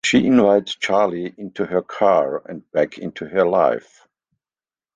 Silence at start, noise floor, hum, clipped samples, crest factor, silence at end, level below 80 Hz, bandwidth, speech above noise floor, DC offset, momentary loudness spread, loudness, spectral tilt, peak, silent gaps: 0.05 s; under -90 dBFS; none; under 0.1%; 16 dB; 1.15 s; -60 dBFS; 9.4 kHz; over 71 dB; under 0.1%; 14 LU; -19 LUFS; -5 dB/octave; -2 dBFS; none